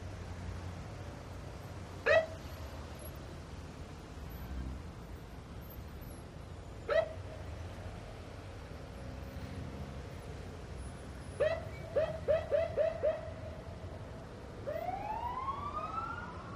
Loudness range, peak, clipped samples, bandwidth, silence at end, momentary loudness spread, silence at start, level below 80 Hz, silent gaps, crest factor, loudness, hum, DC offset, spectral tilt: 11 LU; -18 dBFS; under 0.1%; 14.5 kHz; 0 s; 15 LU; 0 s; -50 dBFS; none; 22 dB; -40 LUFS; none; under 0.1%; -6 dB/octave